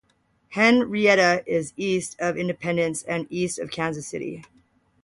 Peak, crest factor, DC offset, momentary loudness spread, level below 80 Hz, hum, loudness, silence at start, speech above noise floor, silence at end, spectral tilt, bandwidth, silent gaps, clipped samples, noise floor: -6 dBFS; 18 dB; under 0.1%; 14 LU; -62 dBFS; none; -23 LUFS; 0.5 s; 40 dB; 0.6 s; -4.5 dB/octave; 11.5 kHz; none; under 0.1%; -63 dBFS